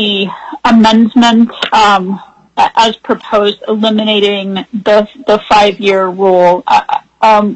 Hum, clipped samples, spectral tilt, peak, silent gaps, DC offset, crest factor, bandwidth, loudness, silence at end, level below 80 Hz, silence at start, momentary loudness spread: none; under 0.1%; -5 dB/octave; 0 dBFS; none; under 0.1%; 10 dB; 8.4 kHz; -10 LUFS; 0 s; -46 dBFS; 0 s; 9 LU